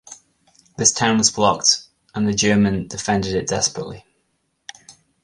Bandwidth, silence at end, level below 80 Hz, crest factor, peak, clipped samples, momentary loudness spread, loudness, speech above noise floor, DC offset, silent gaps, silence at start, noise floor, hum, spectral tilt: 11.5 kHz; 0.3 s; -48 dBFS; 20 dB; -2 dBFS; under 0.1%; 18 LU; -18 LUFS; 50 dB; under 0.1%; none; 0.1 s; -69 dBFS; none; -3 dB/octave